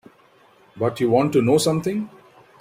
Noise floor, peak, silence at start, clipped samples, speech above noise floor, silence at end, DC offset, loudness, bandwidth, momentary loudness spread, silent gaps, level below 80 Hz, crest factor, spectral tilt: -54 dBFS; -4 dBFS; 0.75 s; under 0.1%; 35 dB; 0.5 s; under 0.1%; -20 LUFS; 16 kHz; 10 LU; none; -60 dBFS; 18 dB; -6 dB/octave